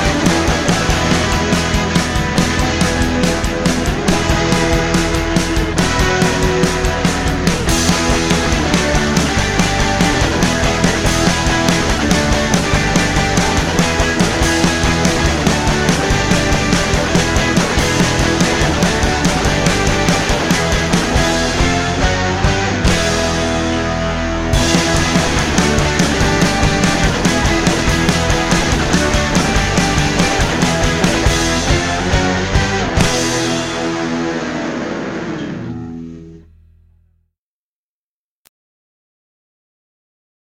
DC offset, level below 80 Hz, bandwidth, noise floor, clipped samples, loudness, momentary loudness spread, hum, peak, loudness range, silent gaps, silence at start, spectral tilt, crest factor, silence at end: under 0.1%; -24 dBFS; 16 kHz; under -90 dBFS; under 0.1%; -14 LUFS; 3 LU; none; 0 dBFS; 3 LU; none; 0 s; -4 dB/octave; 14 dB; 4.05 s